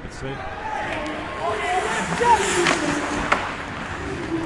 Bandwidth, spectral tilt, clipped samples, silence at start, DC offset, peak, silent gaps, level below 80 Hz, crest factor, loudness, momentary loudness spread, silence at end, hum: 11.5 kHz; -3.5 dB/octave; under 0.1%; 0 s; under 0.1%; -2 dBFS; none; -42 dBFS; 20 dB; -23 LUFS; 12 LU; 0 s; none